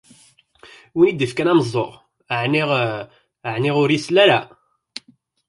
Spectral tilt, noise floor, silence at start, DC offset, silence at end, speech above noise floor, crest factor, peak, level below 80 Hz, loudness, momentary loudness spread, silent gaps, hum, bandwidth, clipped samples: -6 dB/octave; -55 dBFS; 0.95 s; under 0.1%; 1.05 s; 38 dB; 18 dB; -2 dBFS; -62 dBFS; -18 LUFS; 22 LU; none; none; 11.5 kHz; under 0.1%